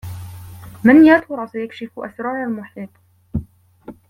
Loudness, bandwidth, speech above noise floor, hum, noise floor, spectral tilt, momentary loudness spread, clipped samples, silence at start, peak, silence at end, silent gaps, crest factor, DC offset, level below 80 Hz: -15 LUFS; 15.5 kHz; 25 dB; none; -41 dBFS; -7.5 dB/octave; 26 LU; under 0.1%; 0.05 s; -2 dBFS; 0.15 s; none; 16 dB; under 0.1%; -46 dBFS